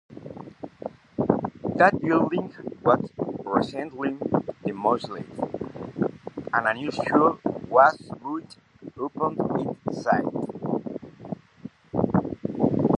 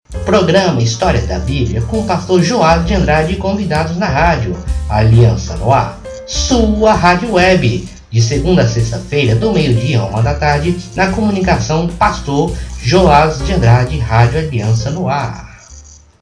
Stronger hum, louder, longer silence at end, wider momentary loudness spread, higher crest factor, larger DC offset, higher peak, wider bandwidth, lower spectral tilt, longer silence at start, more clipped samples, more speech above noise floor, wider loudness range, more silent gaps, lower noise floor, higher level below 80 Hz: neither; second, -25 LUFS vs -13 LUFS; second, 0 s vs 0.4 s; first, 18 LU vs 7 LU; first, 24 dB vs 12 dB; neither; about the same, -2 dBFS vs 0 dBFS; about the same, 10.5 kHz vs 10.5 kHz; first, -8 dB/octave vs -6 dB/octave; about the same, 0.1 s vs 0.1 s; neither; second, 20 dB vs 25 dB; first, 5 LU vs 2 LU; neither; first, -45 dBFS vs -37 dBFS; second, -56 dBFS vs -24 dBFS